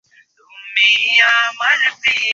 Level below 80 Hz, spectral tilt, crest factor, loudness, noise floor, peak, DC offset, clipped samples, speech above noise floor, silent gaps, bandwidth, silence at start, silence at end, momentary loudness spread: -64 dBFS; 2 dB/octave; 16 dB; -12 LUFS; -50 dBFS; -2 dBFS; under 0.1%; under 0.1%; 36 dB; none; 7.8 kHz; 0.55 s; 0 s; 5 LU